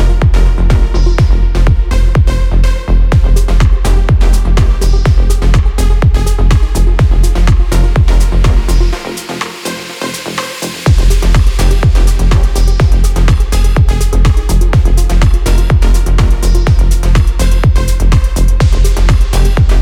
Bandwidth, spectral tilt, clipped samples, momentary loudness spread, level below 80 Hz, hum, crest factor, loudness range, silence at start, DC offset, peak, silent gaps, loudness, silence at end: 13 kHz; -6 dB/octave; under 0.1%; 3 LU; -8 dBFS; none; 6 dB; 2 LU; 0 s; under 0.1%; 0 dBFS; none; -11 LUFS; 0 s